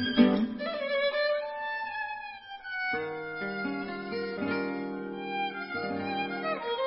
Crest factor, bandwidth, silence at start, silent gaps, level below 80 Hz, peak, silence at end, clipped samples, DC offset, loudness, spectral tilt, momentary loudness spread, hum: 22 dB; 5.8 kHz; 0 s; none; -66 dBFS; -8 dBFS; 0 s; under 0.1%; under 0.1%; -31 LUFS; -9 dB/octave; 9 LU; none